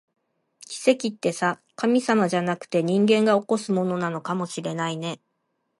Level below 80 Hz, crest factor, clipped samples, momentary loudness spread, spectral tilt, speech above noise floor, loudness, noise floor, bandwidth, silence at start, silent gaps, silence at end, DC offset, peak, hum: -74 dBFS; 18 dB; under 0.1%; 9 LU; -5.5 dB/octave; 52 dB; -24 LUFS; -75 dBFS; 11.5 kHz; 0.7 s; none; 0.65 s; under 0.1%; -6 dBFS; none